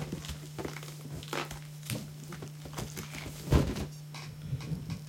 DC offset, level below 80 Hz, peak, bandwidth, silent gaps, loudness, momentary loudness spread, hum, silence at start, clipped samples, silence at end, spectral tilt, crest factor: under 0.1%; -44 dBFS; -12 dBFS; 17 kHz; none; -37 LUFS; 14 LU; none; 0 s; under 0.1%; 0 s; -5.5 dB/octave; 26 dB